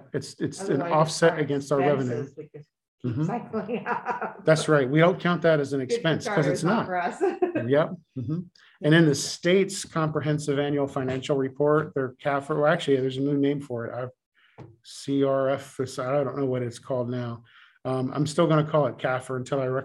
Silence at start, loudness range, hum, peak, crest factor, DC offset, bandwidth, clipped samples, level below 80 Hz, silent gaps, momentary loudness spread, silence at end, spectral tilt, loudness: 0.15 s; 5 LU; none; -6 dBFS; 20 dB; under 0.1%; 12.5 kHz; under 0.1%; -68 dBFS; 2.88-2.98 s, 14.26-14.32 s; 11 LU; 0 s; -6 dB/octave; -25 LUFS